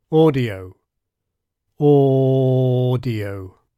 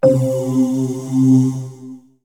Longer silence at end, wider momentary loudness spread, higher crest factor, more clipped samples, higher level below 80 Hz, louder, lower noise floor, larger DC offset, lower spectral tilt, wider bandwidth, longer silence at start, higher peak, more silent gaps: about the same, 0.3 s vs 0.25 s; about the same, 14 LU vs 16 LU; about the same, 14 dB vs 16 dB; neither; about the same, -56 dBFS vs -58 dBFS; about the same, -17 LUFS vs -16 LUFS; first, -79 dBFS vs -37 dBFS; second, under 0.1% vs 0.1%; about the same, -9.5 dB/octave vs -8.5 dB/octave; second, 5 kHz vs 14 kHz; about the same, 0.1 s vs 0.05 s; second, -4 dBFS vs 0 dBFS; neither